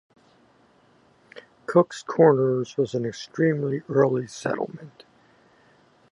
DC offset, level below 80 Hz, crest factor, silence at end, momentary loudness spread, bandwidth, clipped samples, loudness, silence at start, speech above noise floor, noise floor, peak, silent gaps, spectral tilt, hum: under 0.1%; -70 dBFS; 20 dB; 1.25 s; 13 LU; 11 kHz; under 0.1%; -23 LUFS; 1.35 s; 36 dB; -59 dBFS; -4 dBFS; none; -7 dB/octave; none